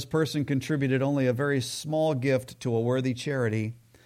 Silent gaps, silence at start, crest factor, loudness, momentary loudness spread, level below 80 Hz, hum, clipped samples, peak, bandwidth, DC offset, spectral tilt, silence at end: none; 0 s; 14 dB; -27 LUFS; 4 LU; -64 dBFS; none; under 0.1%; -14 dBFS; 15.5 kHz; under 0.1%; -6 dB/octave; 0.3 s